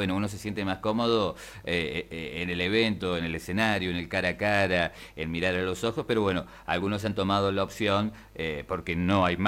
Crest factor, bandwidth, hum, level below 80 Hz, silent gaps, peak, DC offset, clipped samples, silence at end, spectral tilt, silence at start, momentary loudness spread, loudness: 20 dB; 16 kHz; none; -52 dBFS; none; -8 dBFS; under 0.1%; under 0.1%; 0 s; -5.5 dB/octave; 0 s; 8 LU; -28 LUFS